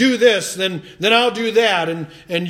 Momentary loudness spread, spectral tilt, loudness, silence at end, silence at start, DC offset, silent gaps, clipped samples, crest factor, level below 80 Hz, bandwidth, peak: 10 LU; -3.5 dB/octave; -16 LUFS; 0 s; 0 s; under 0.1%; none; under 0.1%; 16 dB; -60 dBFS; 15 kHz; 0 dBFS